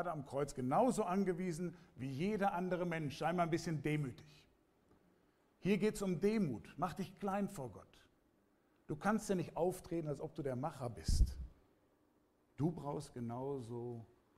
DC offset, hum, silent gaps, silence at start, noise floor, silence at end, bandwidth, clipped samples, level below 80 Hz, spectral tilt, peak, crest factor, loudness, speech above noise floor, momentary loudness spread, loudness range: under 0.1%; none; none; 0 s; -75 dBFS; 0.3 s; 15.5 kHz; under 0.1%; -50 dBFS; -6.5 dB/octave; -20 dBFS; 20 dB; -40 LUFS; 36 dB; 11 LU; 5 LU